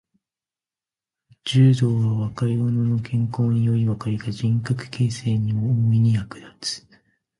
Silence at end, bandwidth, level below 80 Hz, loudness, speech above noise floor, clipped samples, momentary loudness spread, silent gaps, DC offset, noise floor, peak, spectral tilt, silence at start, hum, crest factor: 0.6 s; 11.5 kHz; -52 dBFS; -22 LUFS; over 70 dB; under 0.1%; 12 LU; none; under 0.1%; under -90 dBFS; -6 dBFS; -7 dB/octave; 1.45 s; none; 16 dB